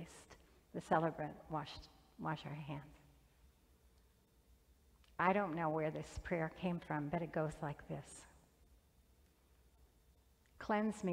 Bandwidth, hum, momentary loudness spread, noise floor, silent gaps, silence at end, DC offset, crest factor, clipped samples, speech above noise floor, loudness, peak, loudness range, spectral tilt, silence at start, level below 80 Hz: 16 kHz; none; 17 LU; -71 dBFS; none; 0 s; under 0.1%; 24 dB; under 0.1%; 31 dB; -41 LUFS; -20 dBFS; 11 LU; -6.5 dB/octave; 0 s; -64 dBFS